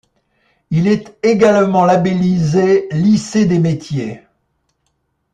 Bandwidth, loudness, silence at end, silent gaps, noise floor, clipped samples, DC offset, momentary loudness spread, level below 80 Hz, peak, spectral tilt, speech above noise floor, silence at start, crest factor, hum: 9.4 kHz; -14 LUFS; 1.15 s; none; -67 dBFS; under 0.1%; under 0.1%; 9 LU; -52 dBFS; -2 dBFS; -7 dB/octave; 54 dB; 0.7 s; 14 dB; none